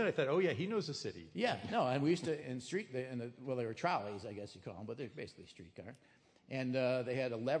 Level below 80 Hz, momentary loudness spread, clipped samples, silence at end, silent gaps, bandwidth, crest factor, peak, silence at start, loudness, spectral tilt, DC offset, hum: -78 dBFS; 16 LU; under 0.1%; 0 s; none; 10.5 kHz; 18 dB; -20 dBFS; 0 s; -38 LUFS; -6 dB/octave; under 0.1%; none